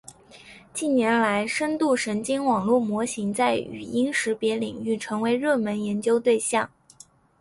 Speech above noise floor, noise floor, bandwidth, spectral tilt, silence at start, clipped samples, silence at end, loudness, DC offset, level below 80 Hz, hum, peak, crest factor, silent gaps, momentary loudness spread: 29 dB; -53 dBFS; 11.5 kHz; -4 dB/octave; 0.1 s; under 0.1%; 0.75 s; -24 LUFS; under 0.1%; -62 dBFS; none; -8 dBFS; 16 dB; none; 7 LU